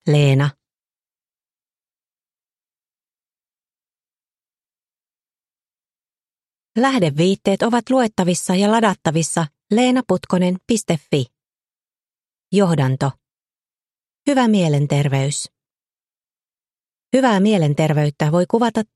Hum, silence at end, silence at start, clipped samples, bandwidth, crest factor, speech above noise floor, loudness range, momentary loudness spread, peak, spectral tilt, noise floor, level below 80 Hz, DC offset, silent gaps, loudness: none; 0.1 s; 0.05 s; under 0.1%; 12.5 kHz; 18 dB; over 73 dB; 5 LU; 7 LU; -2 dBFS; -6 dB/octave; under -90 dBFS; -58 dBFS; under 0.1%; 16.17-16.21 s; -18 LUFS